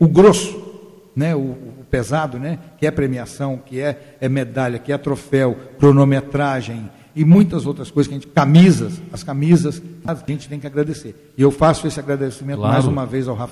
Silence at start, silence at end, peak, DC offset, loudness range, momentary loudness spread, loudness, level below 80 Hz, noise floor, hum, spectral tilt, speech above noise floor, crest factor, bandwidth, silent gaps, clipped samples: 0 s; 0 s; -2 dBFS; under 0.1%; 7 LU; 15 LU; -17 LUFS; -44 dBFS; -39 dBFS; none; -7 dB/octave; 22 dB; 14 dB; 12.5 kHz; none; under 0.1%